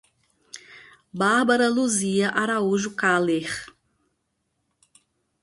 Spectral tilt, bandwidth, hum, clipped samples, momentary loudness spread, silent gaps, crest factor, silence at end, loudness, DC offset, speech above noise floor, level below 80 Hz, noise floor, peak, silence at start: -4 dB/octave; 11.5 kHz; none; under 0.1%; 22 LU; none; 18 dB; 1.75 s; -22 LUFS; under 0.1%; 53 dB; -66 dBFS; -75 dBFS; -6 dBFS; 0.55 s